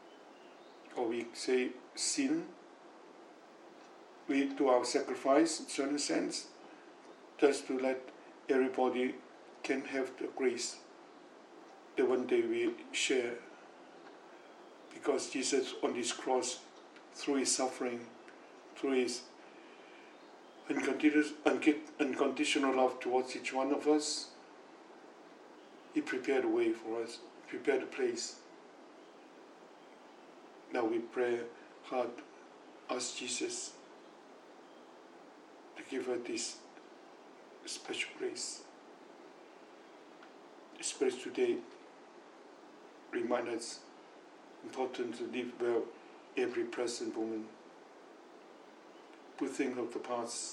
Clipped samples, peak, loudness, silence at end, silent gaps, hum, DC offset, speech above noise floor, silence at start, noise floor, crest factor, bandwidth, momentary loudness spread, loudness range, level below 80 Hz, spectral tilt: under 0.1%; -14 dBFS; -35 LUFS; 0 s; none; none; under 0.1%; 22 dB; 0 s; -57 dBFS; 24 dB; 12 kHz; 25 LU; 9 LU; under -90 dBFS; -2.5 dB/octave